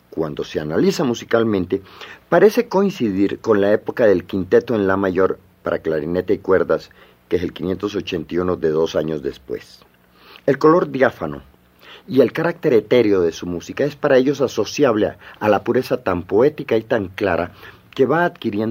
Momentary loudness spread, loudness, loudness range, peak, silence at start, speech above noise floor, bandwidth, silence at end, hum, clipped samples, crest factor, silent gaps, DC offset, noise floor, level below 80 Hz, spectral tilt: 10 LU; -19 LUFS; 4 LU; 0 dBFS; 0.15 s; 29 dB; 16 kHz; 0 s; none; under 0.1%; 18 dB; none; under 0.1%; -47 dBFS; -54 dBFS; -6.5 dB/octave